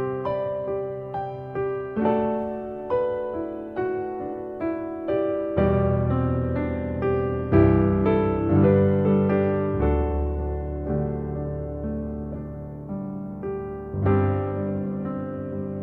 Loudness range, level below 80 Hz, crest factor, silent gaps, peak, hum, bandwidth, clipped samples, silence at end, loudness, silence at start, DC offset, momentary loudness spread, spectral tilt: 8 LU; -36 dBFS; 18 dB; none; -6 dBFS; none; 4.3 kHz; under 0.1%; 0 s; -25 LUFS; 0 s; under 0.1%; 12 LU; -11.5 dB/octave